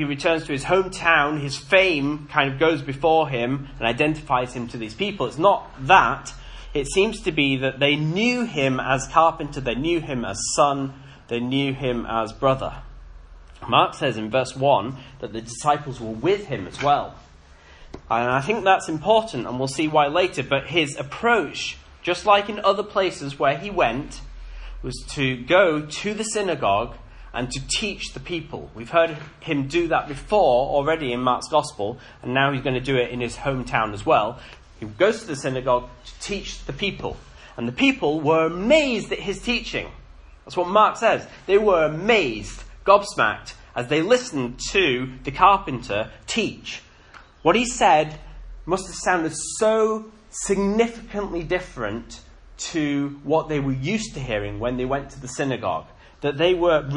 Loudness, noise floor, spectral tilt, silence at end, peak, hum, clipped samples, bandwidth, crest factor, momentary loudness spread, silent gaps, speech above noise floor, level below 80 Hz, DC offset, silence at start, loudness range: -22 LUFS; -48 dBFS; -4.5 dB/octave; 0 s; 0 dBFS; none; under 0.1%; 11 kHz; 22 dB; 13 LU; none; 26 dB; -44 dBFS; under 0.1%; 0 s; 5 LU